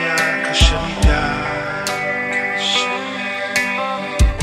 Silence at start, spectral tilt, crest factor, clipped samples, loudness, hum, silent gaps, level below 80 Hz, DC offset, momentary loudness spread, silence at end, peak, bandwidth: 0 s; -3.5 dB/octave; 18 dB; under 0.1%; -18 LUFS; none; none; -22 dBFS; under 0.1%; 7 LU; 0 s; 0 dBFS; 15.5 kHz